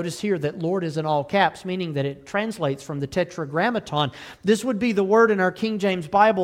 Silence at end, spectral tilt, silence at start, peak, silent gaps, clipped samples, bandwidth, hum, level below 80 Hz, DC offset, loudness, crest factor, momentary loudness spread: 0 s; -5.5 dB/octave; 0 s; -4 dBFS; none; under 0.1%; 15.5 kHz; none; -60 dBFS; under 0.1%; -23 LUFS; 18 dB; 9 LU